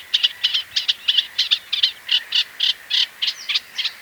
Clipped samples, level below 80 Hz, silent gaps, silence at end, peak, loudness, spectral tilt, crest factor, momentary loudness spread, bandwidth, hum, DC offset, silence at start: under 0.1%; -68 dBFS; none; 0 s; -2 dBFS; -19 LUFS; 3 dB/octave; 20 dB; 4 LU; over 20 kHz; none; under 0.1%; 0 s